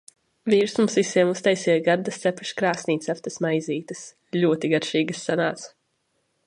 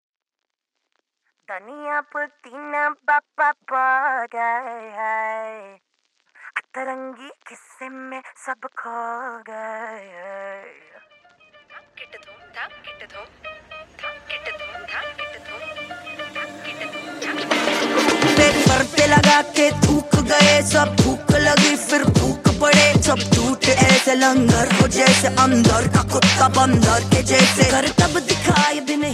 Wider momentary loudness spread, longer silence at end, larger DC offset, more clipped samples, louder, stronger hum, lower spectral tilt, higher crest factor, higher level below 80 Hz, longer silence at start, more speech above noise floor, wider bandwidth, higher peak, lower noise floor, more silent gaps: second, 10 LU vs 21 LU; first, 0.8 s vs 0 s; neither; neither; second, -23 LUFS vs -16 LUFS; neither; about the same, -5 dB/octave vs -4 dB/octave; about the same, 18 dB vs 20 dB; second, -72 dBFS vs -38 dBFS; second, 0.45 s vs 1.5 s; second, 49 dB vs 65 dB; second, 11 kHz vs 15 kHz; second, -6 dBFS vs 0 dBFS; second, -72 dBFS vs -83 dBFS; neither